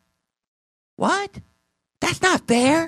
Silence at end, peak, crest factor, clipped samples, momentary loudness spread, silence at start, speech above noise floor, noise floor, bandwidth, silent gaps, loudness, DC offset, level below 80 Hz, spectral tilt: 0 s; -4 dBFS; 20 dB; under 0.1%; 8 LU; 1 s; 52 dB; -72 dBFS; 13.5 kHz; none; -21 LUFS; under 0.1%; -56 dBFS; -3.5 dB/octave